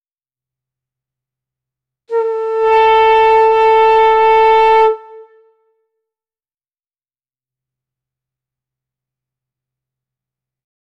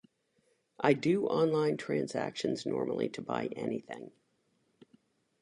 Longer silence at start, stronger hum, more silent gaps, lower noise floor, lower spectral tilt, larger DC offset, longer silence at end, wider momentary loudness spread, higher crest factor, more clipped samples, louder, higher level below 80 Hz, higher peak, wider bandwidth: first, 2.1 s vs 0.8 s; neither; neither; first, under -90 dBFS vs -75 dBFS; second, -3 dB/octave vs -6 dB/octave; neither; first, 5.75 s vs 1.3 s; about the same, 9 LU vs 10 LU; second, 14 dB vs 22 dB; neither; first, -10 LUFS vs -32 LUFS; first, -52 dBFS vs -76 dBFS; first, -2 dBFS vs -12 dBFS; second, 6 kHz vs 11 kHz